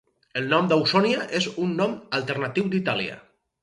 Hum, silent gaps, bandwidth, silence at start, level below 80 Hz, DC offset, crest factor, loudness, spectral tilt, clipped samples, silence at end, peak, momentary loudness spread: none; none; 11 kHz; 0.35 s; -66 dBFS; under 0.1%; 18 dB; -24 LUFS; -5.5 dB/octave; under 0.1%; 0.4 s; -6 dBFS; 8 LU